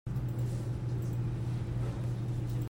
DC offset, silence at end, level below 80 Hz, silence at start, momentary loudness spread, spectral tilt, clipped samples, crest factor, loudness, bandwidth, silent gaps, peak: under 0.1%; 0 s; -46 dBFS; 0.05 s; 1 LU; -8 dB/octave; under 0.1%; 10 dB; -35 LUFS; 16 kHz; none; -24 dBFS